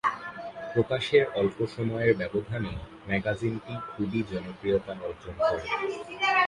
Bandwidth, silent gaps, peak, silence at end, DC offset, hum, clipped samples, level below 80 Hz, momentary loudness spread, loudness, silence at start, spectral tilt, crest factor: 11 kHz; none; -10 dBFS; 0 s; under 0.1%; none; under 0.1%; -52 dBFS; 13 LU; -29 LUFS; 0.05 s; -6.5 dB/octave; 20 dB